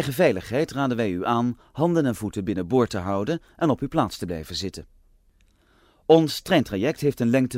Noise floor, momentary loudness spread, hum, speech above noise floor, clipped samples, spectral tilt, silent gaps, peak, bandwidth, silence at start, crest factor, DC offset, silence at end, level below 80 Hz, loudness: -60 dBFS; 10 LU; none; 37 dB; under 0.1%; -6 dB/octave; none; -4 dBFS; 16 kHz; 0 s; 20 dB; under 0.1%; 0 s; -52 dBFS; -24 LUFS